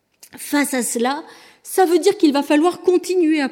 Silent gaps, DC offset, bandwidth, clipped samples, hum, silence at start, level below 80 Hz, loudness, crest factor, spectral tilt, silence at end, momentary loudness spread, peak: none; under 0.1%; 18 kHz; under 0.1%; none; 0.35 s; -74 dBFS; -18 LUFS; 14 dB; -2.5 dB/octave; 0 s; 8 LU; -4 dBFS